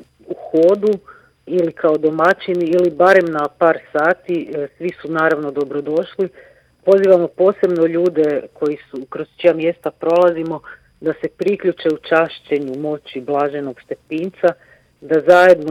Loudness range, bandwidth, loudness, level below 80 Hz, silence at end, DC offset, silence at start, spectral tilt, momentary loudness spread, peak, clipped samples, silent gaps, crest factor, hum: 5 LU; 11 kHz; -17 LUFS; -62 dBFS; 0 s; under 0.1%; 0.3 s; -7 dB/octave; 14 LU; 0 dBFS; under 0.1%; none; 16 dB; none